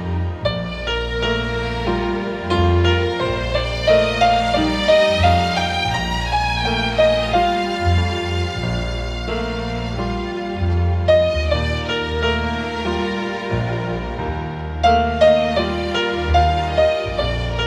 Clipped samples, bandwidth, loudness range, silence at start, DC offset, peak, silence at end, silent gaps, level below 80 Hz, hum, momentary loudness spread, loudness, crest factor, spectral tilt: under 0.1%; 11 kHz; 5 LU; 0 s; under 0.1%; -2 dBFS; 0 s; none; -28 dBFS; none; 9 LU; -19 LUFS; 16 dB; -6 dB/octave